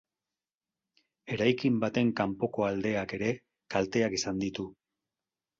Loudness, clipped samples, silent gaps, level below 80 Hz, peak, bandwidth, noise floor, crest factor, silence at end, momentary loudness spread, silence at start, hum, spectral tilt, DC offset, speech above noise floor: -30 LUFS; under 0.1%; none; -62 dBFS; -12 dBFS; 7.6 kHz; under -90 dBFS; 20 dB; 0.85 s; 9 LU; 1.25 s; none; -5.5 dB/octave; under 0.1%; over 60 dB